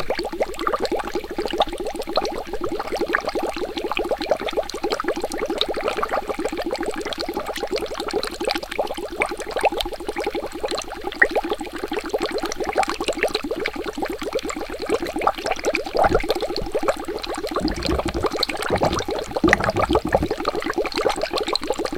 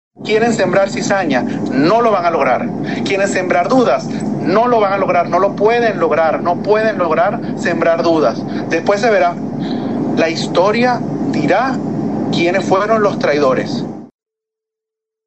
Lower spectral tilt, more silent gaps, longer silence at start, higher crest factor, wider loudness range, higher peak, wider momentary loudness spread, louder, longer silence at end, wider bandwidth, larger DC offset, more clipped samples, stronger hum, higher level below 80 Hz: second, -4 dB/octave vs -5.5 dB/octave; neither; second, 0 s vs 0.2 s; first, 24 dB vs 14 dB; about the same, 4 LU vs 2 LU; about the same, 0 dBFS vs 0 dBFS; about the same, 8 LU vs 6 LU; second, -24 LUFS vs -14 LUFS; second, 0 s vs 1.2 s; first, 17 kHz vs 8.6 kHz; second, under 0.1% vs 0.5%; neither; neither; first, -38 dBFS vs -62 dBFS